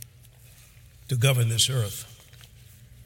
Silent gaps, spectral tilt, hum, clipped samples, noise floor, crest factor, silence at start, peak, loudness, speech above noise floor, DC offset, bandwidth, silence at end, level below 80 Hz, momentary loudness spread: none; -3.5 dB/octave; none; under 0.1%; -51 dBFS; 20 dB; 0 s; -8 dBFS; -24 LUFS; 28 dB; under 0.1%; 17 kHz; 0 s; -56 dBFS; 21 LU